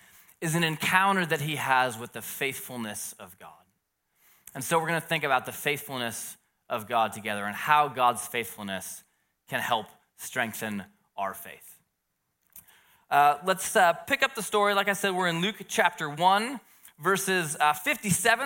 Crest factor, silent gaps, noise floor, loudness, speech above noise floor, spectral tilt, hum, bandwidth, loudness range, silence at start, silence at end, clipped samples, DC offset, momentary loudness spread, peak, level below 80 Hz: 22 dB; none; -79 dBFS; -27 LUFS; 52 dB; -3 dB/octave; none; 17 kHz; 8 LU; 0.4 s; 0 s; under 0.1%; under 0.1%; 14 LU; -6 dBFS; -72 dBFS